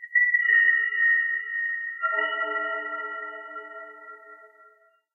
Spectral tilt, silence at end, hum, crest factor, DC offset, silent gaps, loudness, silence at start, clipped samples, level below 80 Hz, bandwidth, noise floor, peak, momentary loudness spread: -1 dB/octave; 0.7 s; none; 16 dB; under 0.1%; none; -23 LUFS; 0 s; under 0.1%; under -90 dBFS; 3.2 kHz; -59 dBFS; -10 dBFS; 23 LU